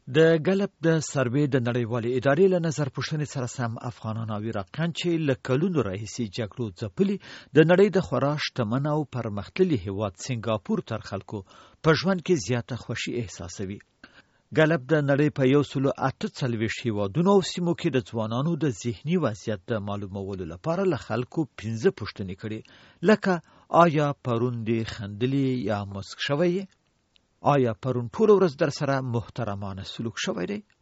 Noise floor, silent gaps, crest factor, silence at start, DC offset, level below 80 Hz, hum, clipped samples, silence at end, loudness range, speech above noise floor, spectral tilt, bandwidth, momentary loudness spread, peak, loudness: -67 dBFS; none; 22 dB; 0.05 s; under 0.1%; -60 dBFS; none; under 0.1%; 0.2 s; 4 LU; 41 dB; -6 dB/octave; 8 kHz; 12 LU; -4 dBFS; -26 LUFS